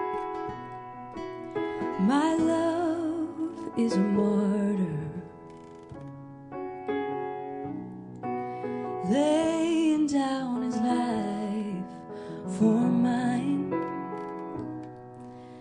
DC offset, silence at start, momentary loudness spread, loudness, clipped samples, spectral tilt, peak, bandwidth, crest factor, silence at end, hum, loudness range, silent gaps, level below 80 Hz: under 0.1%; 0 s; 17 LU; -29 LUFS; under 0.1%; -6.5 dB/octave; -12 dBFS; 10.5 kHz; 16 dB; 0 s; none; 8 LU; none; -64 dBFS